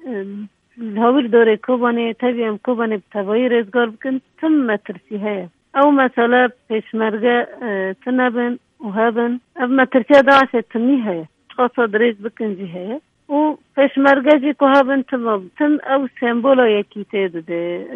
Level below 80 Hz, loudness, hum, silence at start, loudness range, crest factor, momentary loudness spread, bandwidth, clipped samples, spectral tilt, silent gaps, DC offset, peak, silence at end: -66 dBFS; -17 LUFS; none; 0.05 s; 4 LU; 16 dB; 13 LU; 7 kHz; under 0.1%; -7 dB/octave; none; under 0.1%; 0 dBFS; 0 s